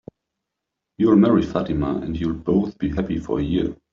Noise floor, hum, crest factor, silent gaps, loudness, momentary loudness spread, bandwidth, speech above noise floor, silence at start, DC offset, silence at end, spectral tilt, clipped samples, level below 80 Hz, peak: -82 dBFS; none; 18 dB; none; -21 LUFS; 9 LU; 7.2 kHz; 62 dB; 1 s; under 0.1%; 0.2 s; -8 dB/octave; under 0.1%; -40 dBFS; -4 dBFS